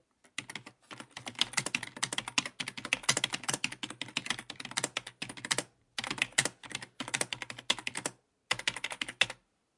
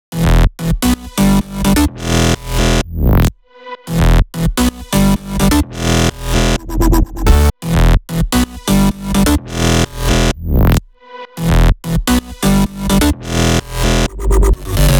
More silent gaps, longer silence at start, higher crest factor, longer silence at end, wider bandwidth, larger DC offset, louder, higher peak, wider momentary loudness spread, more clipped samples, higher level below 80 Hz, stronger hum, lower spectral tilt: neither; first, 0.4 s vs 0.1 s; first, 30 dB vs 12 dB; first, 0.45 s vs 0 s; second, 11.5 kHz vs over 20 kHz; neither; second, -34 LUFS vs -14 LUFS; second, -8 dBFS vs 0 dBFS; first, 13 LU vs 3 LU; neither; second, -70 dBFS vs -16 dBFS; neither; second, -0.5 dB/octave vs -5 dB/octave